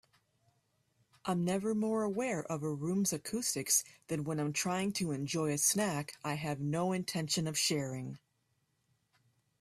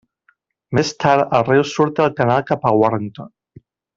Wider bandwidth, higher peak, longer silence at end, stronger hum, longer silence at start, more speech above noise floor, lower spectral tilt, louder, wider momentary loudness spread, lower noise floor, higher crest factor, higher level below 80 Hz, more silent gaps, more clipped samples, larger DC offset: first, 15.5 kHz vs 7.8 kHz; second, -14 dBFS vs 0 dBFS; first, 1.45 s vs 0.7 s; neither; first, 1.25 s vs 0.7 s; about the same, 44 dB vs 45 dB; second, -4 dB/octave vs -6 dB/octave; second, -34 LUFS vs -17 LUFS; about the same, 9 LU vs 8 LU; first, -78 dBFS vs -62 dBFS; about the same, 22 dB vs 18 dB; second, -72 dBFS vs -56 dBFS; neither; neither; neither